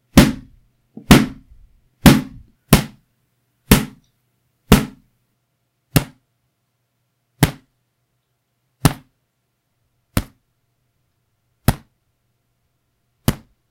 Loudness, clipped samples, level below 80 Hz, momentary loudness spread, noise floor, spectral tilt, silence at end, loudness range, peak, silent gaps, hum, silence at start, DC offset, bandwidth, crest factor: -17 LUFS; 0.2%; -32 dBFS; 22 LU; -71 dBFS; -5 dB/octave; 0.35 s; 12 LU; 0 dBFS; none; none; 0.15 s; under 0.1%; 16 kHz; 20 dB